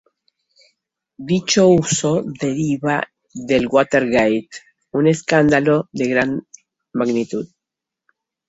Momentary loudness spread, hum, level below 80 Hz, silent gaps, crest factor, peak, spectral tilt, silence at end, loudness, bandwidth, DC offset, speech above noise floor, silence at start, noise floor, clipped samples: 15 LU; none; -54 dBFS; none; 18 dB; 0 dBFS; -5 dB/octave; 1.05 s; -18 LUFS; 8 kHz; under 0.1%; 68 dB; 1.2 s; -85 dBFS; under 0.1%